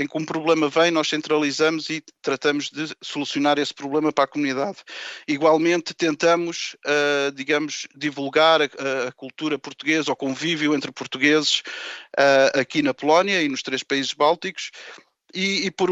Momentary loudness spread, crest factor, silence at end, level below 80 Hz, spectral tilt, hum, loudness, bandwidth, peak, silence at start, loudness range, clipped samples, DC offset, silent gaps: 12 LU; 18 dB; 0 s; -74 dBFS; -3.5 dB/octave; none; -21 LUFS; 8.4 kHz; -4 dBFS; 0 s; 3 LU; under 0.1%; under 0.1%; none